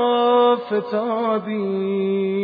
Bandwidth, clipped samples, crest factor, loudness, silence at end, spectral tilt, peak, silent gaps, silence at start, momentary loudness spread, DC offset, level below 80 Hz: 4.9 kHz; under 0.1%; 14 dB; -20 LUFS; 0 s; -9.5 dB/octave; -6 dBFS; none; 0 s; 7 LU; under 0.1%; -74 dBFS